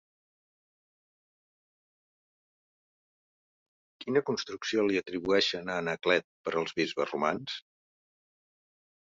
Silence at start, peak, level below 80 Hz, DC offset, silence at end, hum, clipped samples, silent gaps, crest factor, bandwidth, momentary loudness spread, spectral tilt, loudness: 4 s; -12 dBFS; -72 dBFS; under 0.1%; 1.45 s; none; under 0.1%; 6.24-6.44 s; 22 dB; 7.8 kHz; 8 LU; -4 dB/octave; -30 LUFS